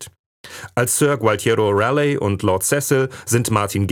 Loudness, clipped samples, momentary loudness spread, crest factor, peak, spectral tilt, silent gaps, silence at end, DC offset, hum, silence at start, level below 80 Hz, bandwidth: -18 LUFS; under 0.1%; 8 LU; 16 dB; -2 dBFS; -4.5 dB/octave; 0.19-0.44 s; 0 s; under 0.1%; none; 0 s; -56 dBFS; 19.5 kHz